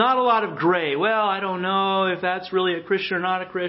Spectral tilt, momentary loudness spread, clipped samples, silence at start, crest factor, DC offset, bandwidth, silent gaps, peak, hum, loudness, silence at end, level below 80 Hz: -9.5 dB/octave; 4 LU; under 0.1%; 0 s; 16 dB; under 0.1%; 5.8 kHz; none; -6 dBFS; none; -22 LUFS; 0 s; -68 dBFS